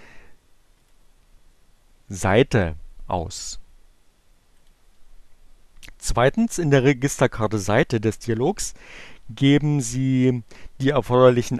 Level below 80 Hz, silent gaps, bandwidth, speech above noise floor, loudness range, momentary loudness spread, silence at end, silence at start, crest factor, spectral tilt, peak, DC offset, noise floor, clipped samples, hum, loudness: -42 dBFS; none; 13 kHz; 36 dB; 8 LU; 16 LU; 0 s; 0 s; 20 dB; -5.5 dB/octave; -2 dBFS; under 0.1%; -56 dBFS; under 0.1%; none; -21 LUFS